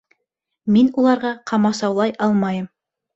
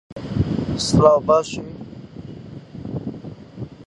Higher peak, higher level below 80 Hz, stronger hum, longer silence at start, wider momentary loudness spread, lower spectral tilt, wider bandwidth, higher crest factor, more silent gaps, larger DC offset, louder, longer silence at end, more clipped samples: second, -4 dBFS vs 0 dBFS; second, -60 dBFS vs -42 dBFS; neither; first, 0.65 s vs 0.1 s; second, 11 LU vs 23 LU; about the same, -6.5 dB/octave vs -6 dB/octave; second, 8 kHz vs 11.5 kHz; second, 14 dB vs 20 dB; second, none vs 0.12-0.16 s; neither; about the same, -18 LUFS vs -19 LUFS; first, 0.5 s vs 0.05 s; neither